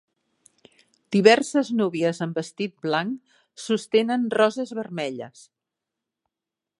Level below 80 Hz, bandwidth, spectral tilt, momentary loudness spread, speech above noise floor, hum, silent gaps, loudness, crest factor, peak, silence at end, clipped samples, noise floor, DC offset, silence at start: -76 dBFS; 11.5 kHz; -5 dB/octave; 15 LU; 65 dB; none; none; -23 LUFS; 24 dB; -2 dBFS; 1.5 s; under 0.1%; -88 dBFS; under 0.1%; 1.1 s